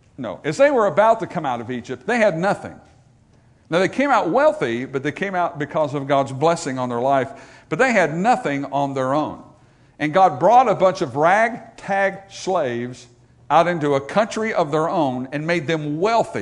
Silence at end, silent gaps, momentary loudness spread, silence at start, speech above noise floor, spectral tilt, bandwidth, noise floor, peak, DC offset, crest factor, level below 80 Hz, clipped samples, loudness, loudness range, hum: 0 s; none; 11 LU; 0.2 s; 34 dB; -5.5 dB/octave; 10.5 kHz; -54 dBFS; -2 dBFS; under 0.1%; 18 dB; -60 dBFS; under 0.1%; -20 LUFS; 3 LU; none